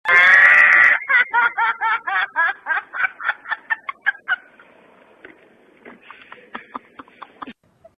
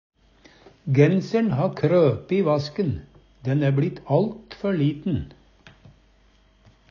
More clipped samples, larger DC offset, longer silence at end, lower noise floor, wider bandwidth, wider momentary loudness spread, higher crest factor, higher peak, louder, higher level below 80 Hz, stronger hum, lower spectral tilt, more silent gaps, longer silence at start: neither; neither; second, 0.45 s vs 1.65 s; second, -52 dBFS vs -58 dBFS; first, 10.5 kHz vs 7 kHz; first, 28 LU vs 11 LU; about the same, 18 dB vs 20 dB; about the same, -2 dBFS vs -4 dBFS; first, -15 LUFS vs -23 LUFS; second, -66 dBFS vs -50 dBFS; neither; second, -1.5 dB/octave vs -8.5 dB/octave; neither; second, 0.05 s vs 0.85 s